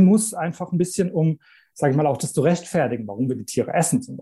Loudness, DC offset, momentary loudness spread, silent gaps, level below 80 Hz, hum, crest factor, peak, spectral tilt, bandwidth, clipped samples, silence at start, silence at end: -22 LUFS; under 0.1%; 6 LU; none; -62 dBFS; none; 16 dB; -6 dBFS; -6 dB/octave; 13 kHz; under 0.1%; 0 s; 0 s